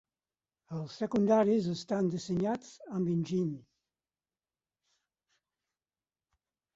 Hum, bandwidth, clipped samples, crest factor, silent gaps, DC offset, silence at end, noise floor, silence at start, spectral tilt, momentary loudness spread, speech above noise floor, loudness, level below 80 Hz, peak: none; 8 kHz; under 0.1%; 20 dB; none; under 0.1%; 3.15 s; under -90 dBFS; 0.7 s; -7.5 dB/octave; 15 LU; over 59 dB; -32 LUFS; -72 dBFS; -16 dBFS